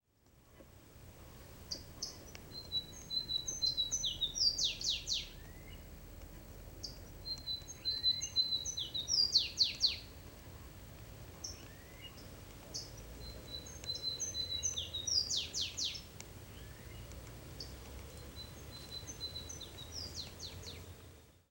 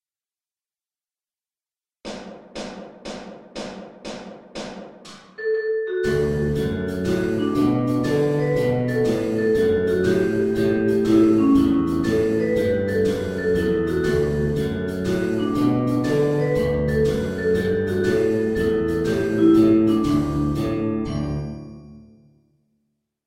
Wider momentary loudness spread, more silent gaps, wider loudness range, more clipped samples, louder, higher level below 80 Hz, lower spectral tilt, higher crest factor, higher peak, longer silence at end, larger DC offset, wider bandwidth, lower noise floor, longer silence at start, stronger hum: about the same, 21 LU vs 19 LU; neither; second, 14 LU vs 17 LU; neither; second, -36 LUFS vs -21 LUFS; second, -56 dBFS vs -40 dBFS; second, -1 dB/octave vs -7.5 dB/octave; first, 24 dB vs 16 dB; second, -16 dBFS vs -6 dBFS; second, 0.15 s vs 1.25 s; neither; about the same, 16 kHz vs 15.5 kHz; second, -67 dBFS vs under -90 dBFS; second, 0.35 s vs 2.05 s; neither